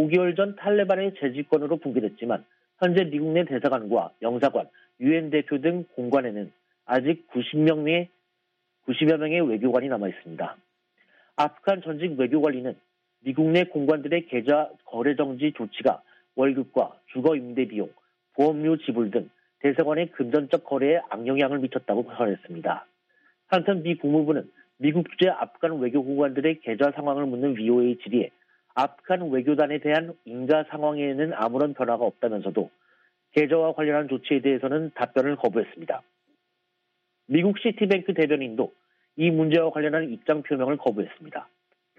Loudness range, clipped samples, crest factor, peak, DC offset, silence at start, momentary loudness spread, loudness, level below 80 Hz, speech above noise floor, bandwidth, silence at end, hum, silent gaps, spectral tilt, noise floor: 2 LU; under 0.1%; 18 dB; -8 dBFS; under 0.1%; 0 s; 10 LU; -25 LUFS; -74 dBFS; 52 dB; 6 kHz; 0.55 s; none; none; -8.5 dB/octave; -76 dBFS